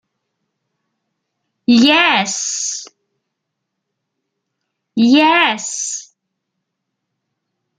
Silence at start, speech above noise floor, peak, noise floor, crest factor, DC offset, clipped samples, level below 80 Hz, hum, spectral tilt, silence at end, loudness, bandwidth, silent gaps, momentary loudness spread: 1.7 s; 63 dB; 0 dBFS; -76 dBFS; 18 dB; under 0.1%; under 0.1%; -66 dBFS; none; -2 dB/octave; 1.75 s; -13 LUFS; 9.6 kHz; none; 14 LU